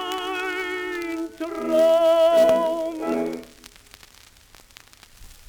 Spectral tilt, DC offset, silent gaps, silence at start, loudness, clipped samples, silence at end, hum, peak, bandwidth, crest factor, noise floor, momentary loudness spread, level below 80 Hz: -3.5 dB/octave; under 0.1%; none; 0 s; -21 LUFS; under 0.1%; 0.15 s; none; -8 dBFS; over 20 kHz; 16 dB; -51 dBFS; 14 LU; -56 dBFS